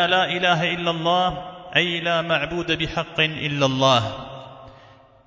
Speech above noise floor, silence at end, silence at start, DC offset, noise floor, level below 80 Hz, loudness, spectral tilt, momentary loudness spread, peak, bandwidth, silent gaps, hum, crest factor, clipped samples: 28 dB; 0.55 s; 0 s; under 0.1%; -49 dBFS; -50 dBFS; -21 LUFS; -4.5 dB/octave; 10 LU; -4 dBFS; 7.6 kHz; none; none; 20 dB; under 0.1%